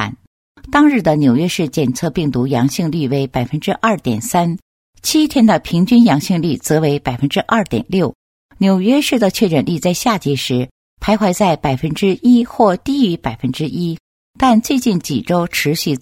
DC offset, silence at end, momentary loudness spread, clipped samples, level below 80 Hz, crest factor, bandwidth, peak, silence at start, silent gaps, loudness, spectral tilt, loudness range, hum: under 0.1%; 0.05 s; 8 LU; under 0.1%; -42 dBFS; 14 dB; 16.5 kHz; 0 dBFS; 0 s; 0.27-0.55 s, 4.62-4.93 s, 8.15-8.49 s, 10.71-10.97 s, 14.00-14.34 s; -15 LUFS; -5.5 dB/octave; 2 LU; none